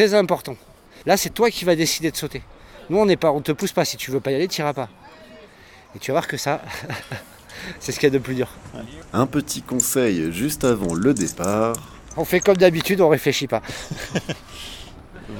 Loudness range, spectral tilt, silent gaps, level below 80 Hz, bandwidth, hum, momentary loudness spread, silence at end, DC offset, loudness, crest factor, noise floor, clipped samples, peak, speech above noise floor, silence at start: 6 LU; -4.5 dB/octave; none; -48 dBFS; 18 kHz; none; 18 LU; 0 s; under 0.1%; -21 LUFS; 22 dB; -47 dBFS; under 0.1%; 0 dBFS; 26 dB; 0 s